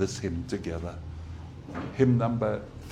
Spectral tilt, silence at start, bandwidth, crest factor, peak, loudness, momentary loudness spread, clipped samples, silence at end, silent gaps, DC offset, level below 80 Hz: -7 dB/octave; 0 s; 10.5 kHz; 20 dB; -8 dBFS; -29 LUFS; 17 LU; under 0.1%; 0 s; none; under 0.1%; -46 dBFS